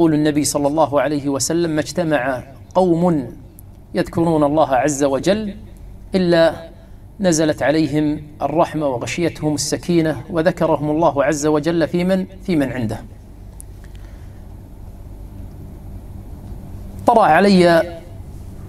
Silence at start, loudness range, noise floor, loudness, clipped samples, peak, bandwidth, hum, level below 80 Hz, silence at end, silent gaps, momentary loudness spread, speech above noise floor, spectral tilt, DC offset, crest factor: 0 s; 10 LU; -39 dBFS; -17 LUFS; under 0.1%; 0 dBFS; 14.5 kHz; none; -40 dBFS; 0 s; none; 23 LU; 22 dB; -5.5 dB/octave; under 0.1%; 18 dB